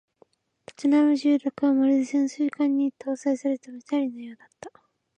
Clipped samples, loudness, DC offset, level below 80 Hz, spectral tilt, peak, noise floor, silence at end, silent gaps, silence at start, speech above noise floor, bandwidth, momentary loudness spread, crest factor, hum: under 0.1%; -24 LUFS; under 0.1%; -78 dBFS; -5 dB/octave; -12 dBFS; -62 dBFS; 0.5 s; none; 0.8 s; 38 dB; 9.2 kHz; 12 LU; 12 dB; none